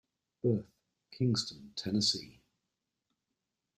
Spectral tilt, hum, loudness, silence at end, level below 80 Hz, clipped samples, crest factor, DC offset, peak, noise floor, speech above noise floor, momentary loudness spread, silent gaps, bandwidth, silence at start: -5 dB/octave; none; -33 LUFS; 1.5 s; -70 dBFS; under 0.1%; 20 dB; under 0.1%; -18 dBFS; -87 dBFS; 54 dB; 10 LU; none; 14 kHz; 0.45 s